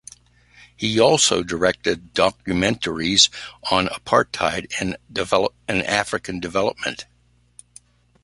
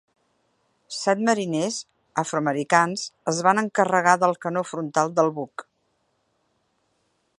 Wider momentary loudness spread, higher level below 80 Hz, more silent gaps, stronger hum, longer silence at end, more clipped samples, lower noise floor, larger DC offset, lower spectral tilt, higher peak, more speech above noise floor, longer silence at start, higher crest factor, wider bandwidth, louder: about the same, 11 LU vs 11 LU; first, -48 dBFS vs -74 dBFS; neither; first, 60 Hz at -50 dBFS vs none; second, 1.2 s vs 1.75 s; neither; second, -52 dBFS vs -71 dBFS; neither; second, -3 dB/octave vs -4.5 dB/octave; about the same, 0 dBFS vs -2 dBFS; second, 31 dB vs 49 dB; about the same, 0.8 s vs 0.9 s; about the same, 22 dB vs 22 dB; about the same, 11.5 kHz vs 11.5 kHz; first, -20 LUFS vs -23 LUFS